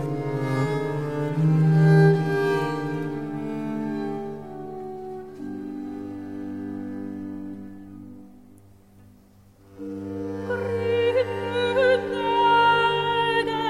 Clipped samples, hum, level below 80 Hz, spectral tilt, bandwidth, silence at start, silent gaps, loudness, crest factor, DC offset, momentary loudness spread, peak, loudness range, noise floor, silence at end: under 0.1%; none; -60 dBFS; -7.5 dB/octave; 10.5 kHz; 0 s; none; -23 LUFS; 18 dB; 0.2%; 18 LU; -6 dBFS; 16 LU; -53 dBFS; 0 s